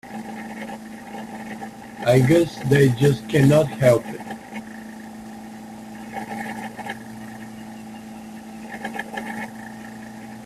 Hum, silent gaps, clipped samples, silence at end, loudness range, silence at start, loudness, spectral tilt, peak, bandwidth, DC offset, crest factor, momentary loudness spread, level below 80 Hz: none; none; under 0.1%; 0 s; 15 LU; 0.05 s; -21 LUFS; -7 dB/octave; -4 dBFS; 14.5 kHz; under 0.1%; 20 dB; 21 LU; -54 dBFS